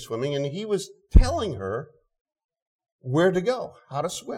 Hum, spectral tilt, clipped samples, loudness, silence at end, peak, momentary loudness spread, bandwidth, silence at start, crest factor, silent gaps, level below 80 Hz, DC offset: none; -6 dB/octave; under 0.1%; -26 LUFS; 0 s; -4 dBFS; 11 LU; 13 kHz; 0 s; 20 dB; 2.21-2.25 s, 2.44-2.49 s, 2.62-2.79 s, 2.92-2.99 s; -28 dBFS; under 0.1%